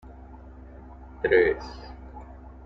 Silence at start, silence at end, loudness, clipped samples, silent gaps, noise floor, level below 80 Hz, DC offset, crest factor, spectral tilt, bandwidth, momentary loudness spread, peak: 0.3 s; 0.15 s; -24 LUFS; under 0.1%; none; -45 dBFS; -44 dBFS; under 0.1%; 22 dB; -7 dB/octave; 6.4 kHz; 25 LU; -6 dBFS